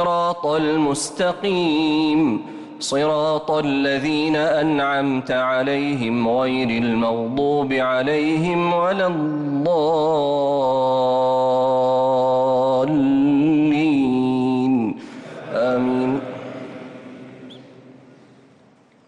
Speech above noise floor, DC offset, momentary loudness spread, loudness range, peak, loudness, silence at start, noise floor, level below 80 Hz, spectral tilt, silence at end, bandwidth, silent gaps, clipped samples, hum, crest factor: 35 dB; under 0.1%; 9 LU; 6 LU; -10 dBFS; -19 LUFS; 0 s; -53 dBFS; -56 dBFS; -5.5 dB/octave; 1.15 s; 11.5 kHz; none; under 0.1%; none; 8 dB